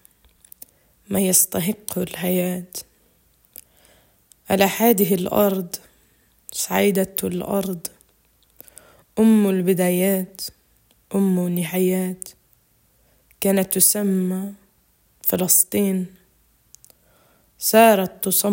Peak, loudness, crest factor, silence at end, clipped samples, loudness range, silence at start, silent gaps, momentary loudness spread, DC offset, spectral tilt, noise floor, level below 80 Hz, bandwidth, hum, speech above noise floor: 0 dBFS; -19 LUFS; 22 dB; 0 s; under 0.1%; 5 LU; 1.1 s; none; 16 LU; under 0.1%; -4.5 dB/octave; -61 dBFS; -60 dBFS; 17 kHz; none; 42 dB